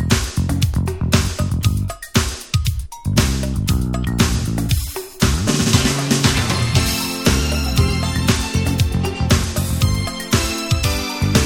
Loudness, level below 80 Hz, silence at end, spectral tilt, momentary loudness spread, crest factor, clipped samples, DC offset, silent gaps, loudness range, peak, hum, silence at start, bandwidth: -18 LUFS; -26 dBFS; 0 s; -4.5 dB/octave; 5 LU; 18 dB; under 0.1%; under 0.1%; none; 3 LU; 0 dBFS; none; 0 s; 18.5 kHz